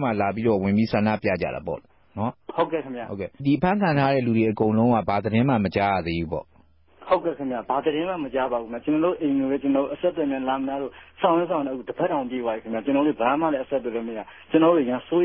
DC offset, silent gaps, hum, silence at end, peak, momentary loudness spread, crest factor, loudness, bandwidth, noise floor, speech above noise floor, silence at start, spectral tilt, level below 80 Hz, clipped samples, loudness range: 0.1%; none; none; 0 s; -6 dBFS; 10 LU; 18 dB; -24 LUFS; 5.8 kHz; -55 dBFS; 32 dB; 0 s; -11.5 dB/octave; -52 dBFS; under 0.1%; 4 LU